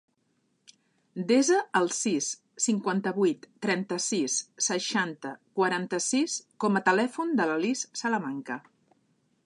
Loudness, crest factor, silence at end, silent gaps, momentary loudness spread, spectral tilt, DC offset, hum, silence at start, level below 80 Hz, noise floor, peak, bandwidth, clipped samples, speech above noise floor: -28 LUFS; 20 dB; 0.85 s; none; 10 LU; -3.5 dB/octave; under 0.1%; none; 1.15 s; -80 dBFS; -73 dBFS; -10 dBFS; 11.5 kHz; under 0.1%; 45 dB